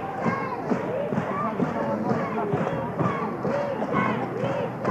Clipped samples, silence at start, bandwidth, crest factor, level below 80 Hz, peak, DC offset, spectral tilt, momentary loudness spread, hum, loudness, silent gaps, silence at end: under 0.1%; 0 s; 12.5 kHz; 16 dB; -58 dBFS; -10 dBFS; under 0.1%; -8 dB/octave; 2 LU; none; -27 LUFS; none; 0 s